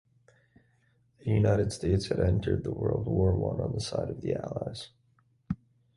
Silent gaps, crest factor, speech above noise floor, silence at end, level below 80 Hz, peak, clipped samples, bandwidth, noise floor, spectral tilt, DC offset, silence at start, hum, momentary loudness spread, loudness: none; 18 dB; 40 dB; 0.4 s; -44 dBFS; -12 dBFS; under 0.1%; 11.5 kHz; -68 dBFS; -7 dB/octave; under 0.1%; 1.25 s; none; 13 LU; -30 LUFS